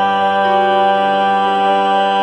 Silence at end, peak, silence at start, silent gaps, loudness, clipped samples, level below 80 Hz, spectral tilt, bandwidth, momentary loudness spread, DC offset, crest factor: 0 s; -2 dBFS; 0 s; none; -13 LUFS; under 0.1%; -60 dBFS; -5.5 dB/octave; 8.2 kHz; 1 LU; under 0.1%; 12 dB